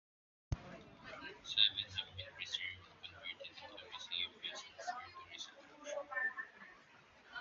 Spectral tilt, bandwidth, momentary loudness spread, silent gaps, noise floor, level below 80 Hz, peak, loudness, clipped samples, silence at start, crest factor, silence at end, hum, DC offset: 0 dB/octave; 7.4 kHz; 19 LU; none; -64 dBFS; -62 dBFS; -16 dBFS; -41 LUFS; under 0.1%; 0.5 s; 30 dB; 0 s; none; under 0.1%